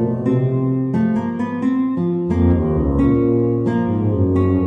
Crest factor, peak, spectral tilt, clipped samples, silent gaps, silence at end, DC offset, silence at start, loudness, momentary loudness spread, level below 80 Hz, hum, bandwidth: 12 dB; -4 dBFS; -11 dB/octave; under 0.1%; none; 0 s; under 0.1%; 0 s; -18 LUFS; 3 LU; -32 dBFS; none; 4.1 kHz